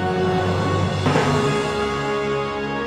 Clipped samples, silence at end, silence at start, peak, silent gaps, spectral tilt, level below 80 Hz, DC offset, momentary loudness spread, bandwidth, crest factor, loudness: under 0.1%; 0 s; 0 s; -6 dBFS; none; -6 dB/octave; -44 dBFS; under 0.1%; 4 LU; 12.5 kHz; 14 dB; -21 LUFS